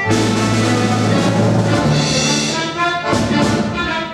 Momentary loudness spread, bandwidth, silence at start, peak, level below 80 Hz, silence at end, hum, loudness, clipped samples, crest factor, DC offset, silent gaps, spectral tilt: 3 LU; 13 kHz; 0 s; -2 dBFS; -40 dBFS; 0 s; none; -15 LUFS; under 0.1%; 12 dB; under 0.1%; none; -4.5 dB/octave